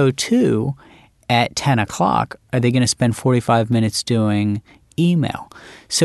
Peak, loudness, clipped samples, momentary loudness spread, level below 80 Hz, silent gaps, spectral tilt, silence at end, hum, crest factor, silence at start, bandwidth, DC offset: -2 dBFS; -18 LUFS; under 0.1%; 11 LU; -50 dBFS; none; -5.5 dB/octave; 0 s; none; 16 dB; 0 s; 12.5 kHz; under 0.1%